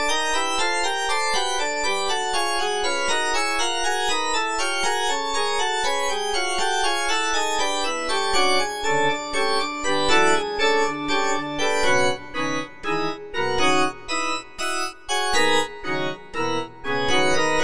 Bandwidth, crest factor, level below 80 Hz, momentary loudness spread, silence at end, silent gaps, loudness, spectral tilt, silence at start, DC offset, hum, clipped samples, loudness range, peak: 10.5 kHz; 16 dB; -48 dBFS; 7 LU; 0 s; none; -22 LUFS; -1.5 dB/octave; 0 s; 3%; none; under 0.1%; 2 LU; -6 dBFS